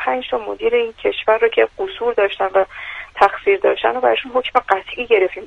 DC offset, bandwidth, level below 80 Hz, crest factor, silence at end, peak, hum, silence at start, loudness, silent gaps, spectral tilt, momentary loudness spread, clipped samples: under 0.1%; 7.6 kHz; -50 dBFS; 18 dB; 0 s; 0 dBFS; none; 0 s; -17 LUFS; none; -4.5 dB/octave; 6 LU; under 0.1%